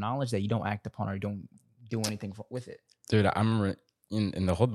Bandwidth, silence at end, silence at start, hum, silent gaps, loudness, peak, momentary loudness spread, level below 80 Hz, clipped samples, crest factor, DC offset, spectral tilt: 13.5 kHz; 0 s; 0 s; none; none; -31 LUFS; -10 dBFS; 14 LU; -58 dBFS; under 0.1%; 22 dB; under 0.1%; -6.5 dB/octave